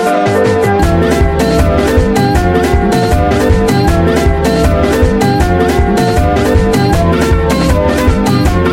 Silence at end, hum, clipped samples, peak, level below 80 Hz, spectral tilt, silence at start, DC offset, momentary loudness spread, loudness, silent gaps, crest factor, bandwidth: 0 s; none; under 0.1%; 0 dBFS; -18 dBFS; -6.5 dB/octave; 0 s; under 0.1%; 1 LU; -10 LUFS; none; 10 dB; 16.5 kHz